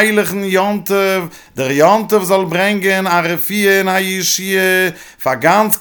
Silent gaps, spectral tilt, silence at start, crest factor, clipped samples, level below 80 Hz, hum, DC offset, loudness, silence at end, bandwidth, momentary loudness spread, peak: none; -3.5 dB/octave; 0 s; 14 dB; under 0.1%; -56 dBFS; none; under 0.1%; -13 LUFS; 0 s; 19 kHz; 7 LU; 0 dBFS